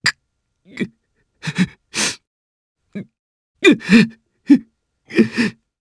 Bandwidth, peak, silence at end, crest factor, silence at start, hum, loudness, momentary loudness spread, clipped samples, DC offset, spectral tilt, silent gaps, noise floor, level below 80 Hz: 11 kHz; 0 dBFS; 0.3 s; 20 dB; 0.05 s; none; -17 LUFS; 21 LU; under 0.1%; under 0.1%; -4.5 dB/octave; 2.27-2.75 s, 3.19-3.55 s; -71 dBFS; -56 dBFS